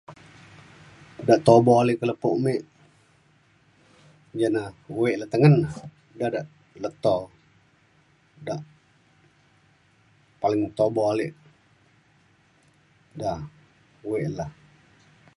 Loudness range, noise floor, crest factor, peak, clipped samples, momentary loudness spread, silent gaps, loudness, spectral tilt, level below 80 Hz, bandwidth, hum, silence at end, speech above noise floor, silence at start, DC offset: 12 LU; -61 dBFS; 24 dB; -2 dBFS; under 0.1%; 22 LU; none; -24 LUFS; -7.5 dB/octave; -60 dBFS; 11.5 kHz; none; 0.85 s; 39 dB; 0.1 s; under 0.1%